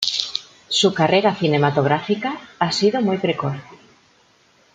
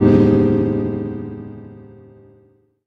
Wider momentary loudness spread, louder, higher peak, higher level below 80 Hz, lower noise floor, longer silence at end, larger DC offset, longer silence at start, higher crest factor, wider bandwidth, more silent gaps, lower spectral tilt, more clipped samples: second, 11 LU vs 23 LU; about the same, -19 LUFS vs -17 LUFS; about the same, 0 dBFS vs -2 dBFS; second, -62 dBFS vs -40 dBFS; about the same, -56 dBFS vs -55 dBFS; about the same, 1 s vs 1.05 s; neither; about the same, 0 s vs 0 s; about the same, 20 dB vs 18 dB; first, 9.4 kHz vs 6 kHz; neither; second, -4.5 dB/octave vs -10.5 dB/octave; neither